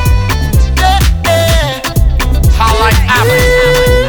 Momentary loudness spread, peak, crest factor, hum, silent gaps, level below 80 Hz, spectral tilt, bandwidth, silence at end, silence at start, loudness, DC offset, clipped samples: 4 LU; 0 dBFS; 8 dB; none; none; -12 dBFS; -4.5 dB/octave; over 20 kHz; 0 s; 0 s; -10 LUFS; under 0.1%; under 0.1%